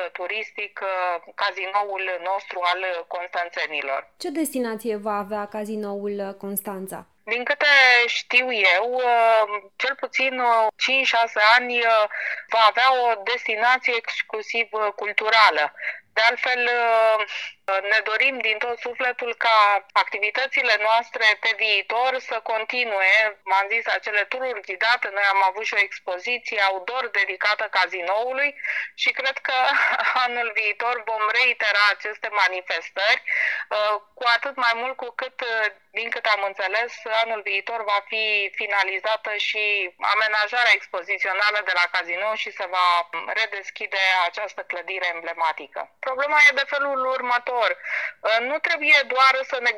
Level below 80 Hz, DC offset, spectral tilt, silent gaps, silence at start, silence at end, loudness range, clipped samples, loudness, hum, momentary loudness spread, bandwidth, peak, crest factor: -80 dBFS; under 0.1%; -1.5 dB/octave; none; 0 s; 0 s; 7 LU; under 0.1%; -21 LUFS; none; 11 LU; 16 kHz; -4 dBFS; 18 dB